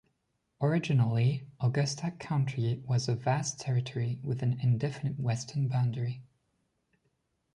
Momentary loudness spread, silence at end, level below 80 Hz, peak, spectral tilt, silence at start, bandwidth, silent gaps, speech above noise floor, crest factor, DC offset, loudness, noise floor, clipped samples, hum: 6 LU; 1.35 s; -64 dBFS; -16 dBFS; -6 dB/octave; 0.6 s; 10.5 kHz; none; 49 dB; 14 dB; under 0.1%; -31 LUFS; -78 dBFS; under 0.1%; none